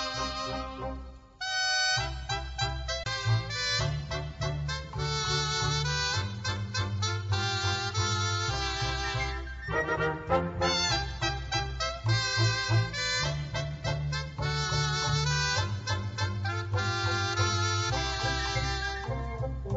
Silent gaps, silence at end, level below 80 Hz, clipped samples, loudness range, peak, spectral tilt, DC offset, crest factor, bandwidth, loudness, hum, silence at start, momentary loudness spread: none; 0 s; -42 dBFS; under 0.1%; 2 LU; -14 dBFS; -3.5 dB/octave; under 0.1%; 16 dB; 8 kHz; -30 LUFS; none; 0 s; 7 LU